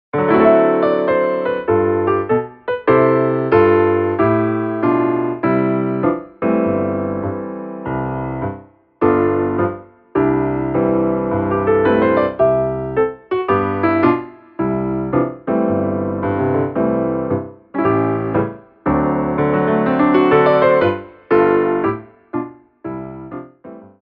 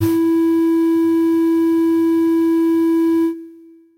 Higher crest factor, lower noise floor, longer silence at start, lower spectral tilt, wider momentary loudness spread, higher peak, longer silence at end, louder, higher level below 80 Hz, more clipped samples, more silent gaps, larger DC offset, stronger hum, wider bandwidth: first, 16 dB vs 8 dB; second, -38 dBFS vs -43 dBFS; first, 0.15 s vs 0 s; first, -11 dB/octave vs -7.5 dB/octave; first, 13 LU vs 1 LU; first, 0 dBFS vs -8 dBFS; second, 0.2 s vs 0.45 s; about the same, -17 LUFS vs -16 LUFS; first, -46 dBFS vs -62 dBFS; neither; neither; neither; neither; second, 5.2 kHz vs 16 kHz